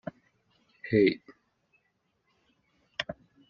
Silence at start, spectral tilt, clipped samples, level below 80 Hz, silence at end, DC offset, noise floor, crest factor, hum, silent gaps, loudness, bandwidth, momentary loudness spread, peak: 0.85 s; -5 dB/octave; under 0.1%; -66 dBFS; 0.35 s; under 0.1%; -76 dBFS; 22 dB; none; none; -29 LUFS; 7 kHz; 20 LU; -12 dBFS